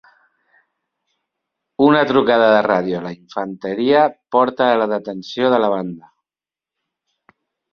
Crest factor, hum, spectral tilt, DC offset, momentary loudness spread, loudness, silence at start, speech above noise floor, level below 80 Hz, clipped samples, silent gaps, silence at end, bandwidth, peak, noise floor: 18 dB; none; -7 dB/octave; under 0.1%; 14 LU; -17 LUFS; 1.8 s; over 74 dB; -62 dBFS; under 0.1%; none; 1.75 s; 6.8 kHz; -2 dBFS; under -90 dBFS